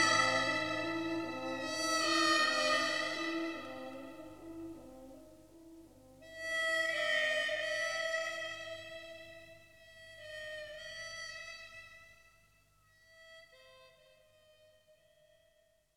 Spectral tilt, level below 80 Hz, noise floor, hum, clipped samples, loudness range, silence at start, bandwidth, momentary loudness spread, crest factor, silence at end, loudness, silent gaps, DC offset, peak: -2 dB/octave; -72 dBFS; -72 dBFS; 50 Hz at -70 dBFS; under 0.1%; 15 LU; 0 s; 16.5 kHz; 25 LU; 20 dB; 2.05 s; -34 LUFS; none; under 0.1%; -18 dBFS